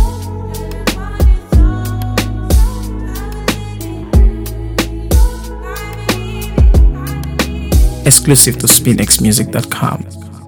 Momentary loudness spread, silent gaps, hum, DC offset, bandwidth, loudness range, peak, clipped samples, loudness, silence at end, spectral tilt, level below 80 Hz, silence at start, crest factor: 16 LU; none; none; under 0.1%; over 20 kHz; 7 LU; 0 dBFS; 0.4%; -13 LUFS; 0 s; -4 dB/octave; -16 dBFS; 0 s; 12 dB